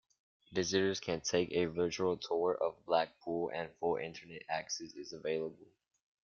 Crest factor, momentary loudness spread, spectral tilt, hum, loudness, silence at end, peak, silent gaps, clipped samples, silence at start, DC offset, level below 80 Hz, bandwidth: 22 dB; 9 LU; -4 dB/octave; none; -36 LUFS; 0.75 s; -16 dBFS; none; under 0.1%; 0.5 s; under 0.1%; -72 dBFS; 7.2 kHz